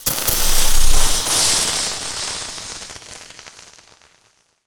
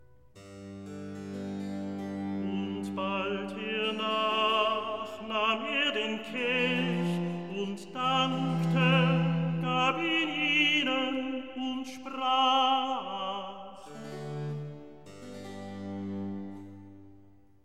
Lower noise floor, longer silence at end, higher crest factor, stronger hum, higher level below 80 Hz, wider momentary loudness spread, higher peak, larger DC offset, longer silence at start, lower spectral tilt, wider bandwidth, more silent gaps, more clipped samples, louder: about the same, -59 dBFS vs -59 dBFS; first, 1.05 s vs 0.45 s; about the same, 14 dB vs 18 dB; neither; first, -22 dBFS vs -70 dBFS; about the same, 21 LU vs 19 LU; first, -2 dBFS vs -14 dBFS; second, under 0.1% vs 0.2%; second, 0 s vs 0.35 s; second, -0.5 dB/octave vs -5.5 dB/octave; first, over 20 kHz vs 11.5 kHz; neither; neither; first, -17 LUFS vs -29 LUFS